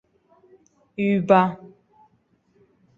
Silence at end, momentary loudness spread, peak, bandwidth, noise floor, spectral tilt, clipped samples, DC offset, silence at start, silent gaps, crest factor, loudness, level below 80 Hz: 1.3 s; 22 LU; -2 dBFS; 7 kHz; -64 dBFS; -8.5 dB/octave; under 0.1%; under 0.1%; 1 s; none; 24 dB; -20 LUFS; -66 dBFS